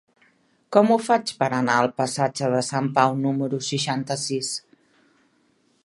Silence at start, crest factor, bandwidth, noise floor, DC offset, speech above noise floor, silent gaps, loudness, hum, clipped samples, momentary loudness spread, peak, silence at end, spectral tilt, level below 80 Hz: 0.7 s; 22 dB; 11.5 kHz; -64 dBFS; under 0.1%; 42 dB; none; -22 LUFS; none; under 0.1%; 7 LU; -2 dBFS; 1.25 s; -4.5 dB/octave; -70 dBFS